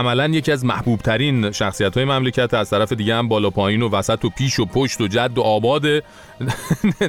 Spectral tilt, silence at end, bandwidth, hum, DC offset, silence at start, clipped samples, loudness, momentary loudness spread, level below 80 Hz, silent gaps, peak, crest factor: -5.5 dB/octave; 0 s; 16.5 kHz; none; under 0.1%; 0 s; under 0.1%; -19 LUFS; 3 LU; -44 dBFS; none; -6 dBFS; 14 dB